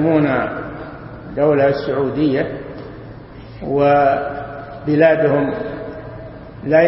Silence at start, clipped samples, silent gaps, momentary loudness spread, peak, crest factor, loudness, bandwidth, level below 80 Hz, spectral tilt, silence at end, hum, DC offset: 0 s; under 0.1%; none; 21 LU; 0 dBFS; 18 dB; -17 LUFS; 5.8 kHz; -44 dBFS; -12 dB/octave; 0 s; none; under 0.1%